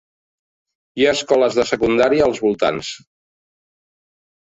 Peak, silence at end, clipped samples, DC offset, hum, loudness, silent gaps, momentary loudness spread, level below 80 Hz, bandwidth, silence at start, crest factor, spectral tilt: -2 dBFS; 1.55 s; under 0.1%; under 0.1%; none; -17 LUFS; none; 14 LU; -50 dBFS; 8.2 kHz; 0.95 s; 18 dB; -4 dB/octave